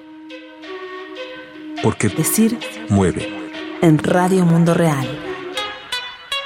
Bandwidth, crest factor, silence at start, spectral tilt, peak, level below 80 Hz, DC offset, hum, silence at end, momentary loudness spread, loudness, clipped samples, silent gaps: 16.5 kHz; 18 dB; 0 s; -5.5 dB/octave; -2 dBFS; -52 dBFS; under 0.1%; none; 0 s; 18 LU; -18 LUFS; under 0.1%; none